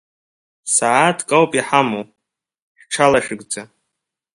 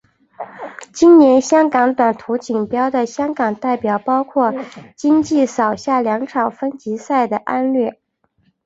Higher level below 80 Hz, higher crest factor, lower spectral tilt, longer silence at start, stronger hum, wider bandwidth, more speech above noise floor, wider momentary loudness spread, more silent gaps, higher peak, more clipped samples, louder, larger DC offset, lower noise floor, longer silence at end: about the same, -56 dBFS vs -58 dBFS; first, 20 dB vs 14 dB; second, -3 dB/octave vs -5.5 dB/octave; first, 0.65 s vs 0.4 s; neither; first, 11.5 kHz vs 8 kHz; first, 64 dB vs 46 dB; second, 13 LU vs 16 LU; first, 2.62-2.75 s vs none; about the same, 0 dBFS vs -2 dBFS; neither; about the same, -16 LUFS vs -16 LUFS; neither; first, -80 dBFS vs -62 dBFS; about the same, 0.7 s vs 0.75 s